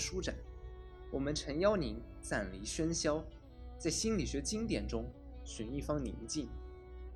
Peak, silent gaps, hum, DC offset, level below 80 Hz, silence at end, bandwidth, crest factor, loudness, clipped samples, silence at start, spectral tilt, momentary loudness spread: -18 dBFS; none; none; under 0.1%; -48 dBFS; 0 s; 13 kHz; 20 dB; -38 LUFS; under 0.1%; 0 s; -4.5 dB/octave; 18 LU